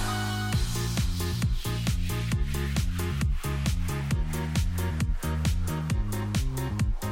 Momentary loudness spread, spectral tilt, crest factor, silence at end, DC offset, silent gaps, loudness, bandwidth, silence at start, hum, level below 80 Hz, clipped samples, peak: 1 LU; -5 dB/octave; 12 dB; 0 s; under 0.1%; none; -29 LUFS; 17 kHz; 0 s; none; -32 dBFS; under 0.1%; -16 dBFS